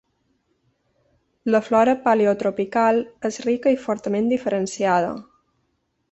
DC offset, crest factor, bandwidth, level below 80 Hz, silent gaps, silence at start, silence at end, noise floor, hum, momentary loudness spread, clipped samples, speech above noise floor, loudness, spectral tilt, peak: under 0.1%; 18 dB; 8.4 kHz; -62 dBFS; none; 1.45 s; 0.9 s; -71 dBFS; none; 8 LU; under 0.1%; 51 dB; -21 LUFS; -5.5 dB/octave; -4 dBFS